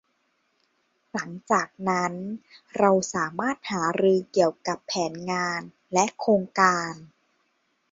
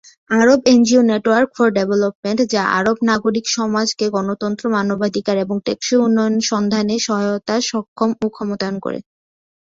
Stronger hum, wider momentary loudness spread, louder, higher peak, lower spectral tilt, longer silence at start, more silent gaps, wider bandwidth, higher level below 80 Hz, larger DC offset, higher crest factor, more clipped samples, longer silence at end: neither; first, 13 LU vs 9 LU; second, -25 LUFS vs -17 LUFS; second, -4 dBFS vs 0 dBFS; about the same, -4.5 dB/octave vs -4.5 dB/octave; first, 1.15 s vs 0.3 s; second, none vs 2.15-2.23 s, 7.88-7.96 s; about the same, 7.8 kHz vs 7.8 kHz; second, -68 dBFS vs -58 dBFS; neither; first, 22 dB vs 16 dB; neither; about the same, 0.85 s vs 0.75 s